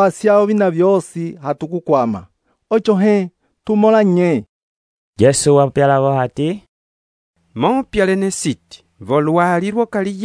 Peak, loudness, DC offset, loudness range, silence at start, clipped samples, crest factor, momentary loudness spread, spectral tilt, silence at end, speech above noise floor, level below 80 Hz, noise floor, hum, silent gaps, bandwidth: 0 dBFS; -15 LUFS; under 0.1%; 4 LU; 0 s; under 0.1%; 16 dB; 12 LU; -6 dB/octave; 0 s; over 75 dB; -50 dBFS; under -90 dBFS; none; 4.49-5.13 s, 6.68-7.34 s; 11 kHz